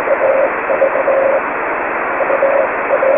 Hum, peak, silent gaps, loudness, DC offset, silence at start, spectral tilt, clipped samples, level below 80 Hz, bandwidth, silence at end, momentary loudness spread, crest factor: none; -2 dBFS; none; -14 LUFS; under 0.1%; 0 s; -10 dB/octave; under 0.1%; -52 dBFS; 3.6 kHz; 0 s; 4 LU; 12 dB